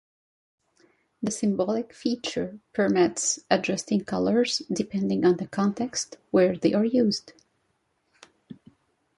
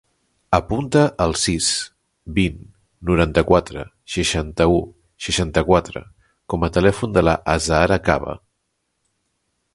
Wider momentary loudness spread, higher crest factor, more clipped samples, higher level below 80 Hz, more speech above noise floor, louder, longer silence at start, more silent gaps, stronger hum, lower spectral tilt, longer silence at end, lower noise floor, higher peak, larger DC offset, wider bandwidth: second, 8 LU vs 15 LU; about the same, 20 dB vs 20 dB; neither; second, -64 dBFS vs -34 dBFS; second, 48 dB vs 54 dB; second, -25 LUFS vs -19 LUFS; first, 1.2 s vs 0.5 s; neither; neither; about the same, -4.5 dB/octave vs -4.5 dB/octave; second, 0.65 s vs 1.4 s; about the same, -73 dBFS vs -73 dBFS; second, -6 dBFS vs 0 dBFS; neither; about the same, 11.5 kHz vs 11.5 kHz